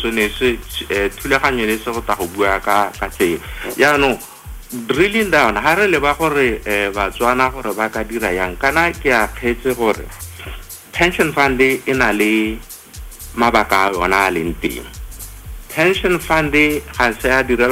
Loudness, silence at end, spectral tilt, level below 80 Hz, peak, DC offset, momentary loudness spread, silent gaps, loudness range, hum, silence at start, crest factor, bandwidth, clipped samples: -16 LUFS; 0 s; -4 dB/octave; -34 dBFS; -2 dBFS; under 0.1%; 17 LU; none; 3 LU; none; 0 s; 14 dB; 16 kHz; under 0.1%